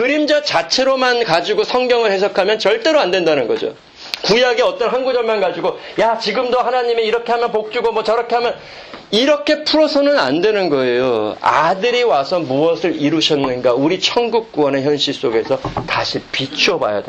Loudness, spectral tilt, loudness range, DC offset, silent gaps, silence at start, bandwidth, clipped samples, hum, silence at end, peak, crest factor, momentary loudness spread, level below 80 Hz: -15 LUFS; -4 dB/octave; 2 LU; under 0.1%; none; 0 s; 8.6 kHz; under 0.1%; none; 0 s; 0 dBFS; 16 dB; 6 LU; -52 dBFS